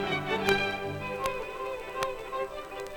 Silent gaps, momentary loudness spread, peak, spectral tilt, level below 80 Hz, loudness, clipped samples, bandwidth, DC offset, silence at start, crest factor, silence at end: none; 9 LU; -8 dBFS; -4 dB/octave; -52 dBFS; -32 LUFS; under 0.1%; over 20 kHz; under 0.1%; 0 s; 24 dB; 0 s